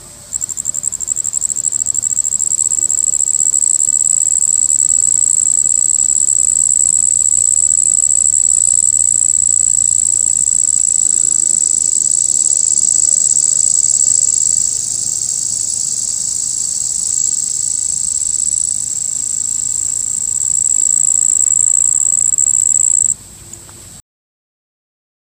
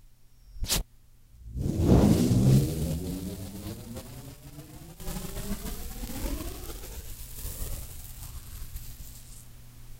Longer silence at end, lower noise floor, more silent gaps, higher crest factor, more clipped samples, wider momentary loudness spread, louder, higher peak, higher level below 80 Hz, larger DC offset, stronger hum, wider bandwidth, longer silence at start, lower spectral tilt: first, 1.25 s vs 0 s; second, -34 dBFS vs -55 dBFS; neither; second, 14 dB vs 24 dB; neither; second, 6 LU vs 24 LU; first, -10 LUFS vs -29 LUFS; first, 0 dBFS vs -6 dBFS; second, -50 dBFS vs -38 dBFS; neither; neither; about the same, 16 kHz vs 16 kHz; about the same, 0 s vs 0.05 s; second, 1 dB/octave vs -6 dB/octave